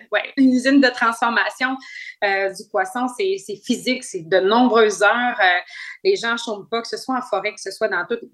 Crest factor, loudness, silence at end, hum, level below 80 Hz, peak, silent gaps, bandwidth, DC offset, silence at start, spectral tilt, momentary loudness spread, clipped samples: 18 dB; -19 LUFS; 0.05 s; none; -74 dBFS; -2 dBFS; none; 12.5 kHz; under 0.1%; 0.1 s; -3 dB/octave; 10 LU; under 0.1%